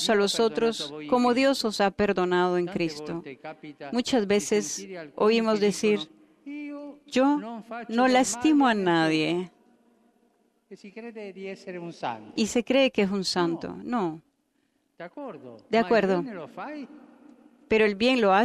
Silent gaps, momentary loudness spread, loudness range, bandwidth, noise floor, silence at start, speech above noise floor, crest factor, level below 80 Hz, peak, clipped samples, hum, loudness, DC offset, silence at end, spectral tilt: none; 19 LU; 5 LU; 14 kHz; -72 dBFS; 0 s; 46 dB; 16 dB; -62 dBFS; -10 dBFS; under 0.1%; none; -25 LUFS; under 0.1%; 0 s; -4.5 dB/octave